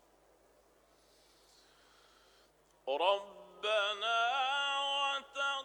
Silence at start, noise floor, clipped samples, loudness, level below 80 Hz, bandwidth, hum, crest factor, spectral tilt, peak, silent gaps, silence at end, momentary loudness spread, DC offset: 2.85 s; -68 dBFS; under 0.1%; -33 LUFS; -80 dBFS; 19 kHz; none; 20 dB; 0 dB/octave; -18 dBFS; none; 0 s; 8 LU; under 0.1%